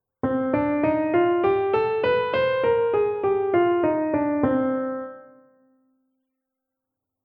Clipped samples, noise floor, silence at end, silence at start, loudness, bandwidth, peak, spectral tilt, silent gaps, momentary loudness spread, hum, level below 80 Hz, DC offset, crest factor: under 0.1%; -84 dBFS; 2 s; 0.25 s; -22 LUFS; 5.2 kHz; -8 dBFS; -9.5 dB/octave; none; 5 LU; none; -56 dBFS; under 0.1%; 16 dB